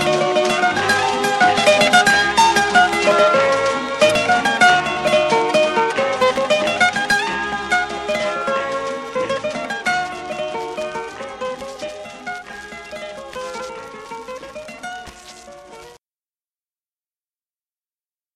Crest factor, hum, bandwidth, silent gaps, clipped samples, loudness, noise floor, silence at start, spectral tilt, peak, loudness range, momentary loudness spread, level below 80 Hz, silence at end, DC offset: 18 dB; none; 13.5 kHz; none; under 0.1%; -16 LUFS; under -90 dBFS; 0 s; -2.5 dB/octave; 0 dBFS; 19 LU; 18 LU; -52 dBFS; 2.4 s; under 0.1%